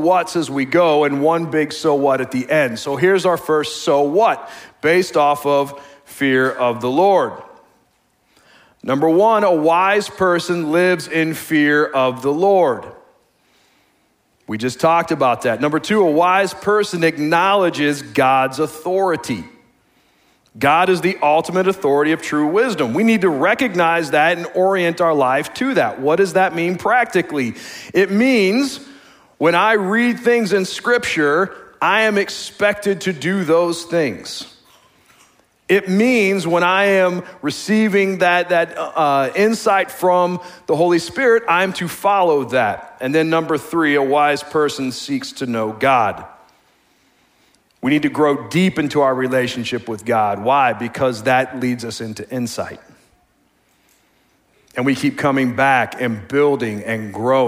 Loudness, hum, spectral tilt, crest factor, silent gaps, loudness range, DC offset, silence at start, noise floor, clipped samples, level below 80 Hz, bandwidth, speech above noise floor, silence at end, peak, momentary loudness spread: -17 LUFS; none; -5 dB/octave; 16 dB; none; 4 LU; under 0.1%; 0 s; -61 dBFS; under 0.1%; -60 dBFS; 16 kHz; 44 dB; 0 s; -2 dBFS; 9 LU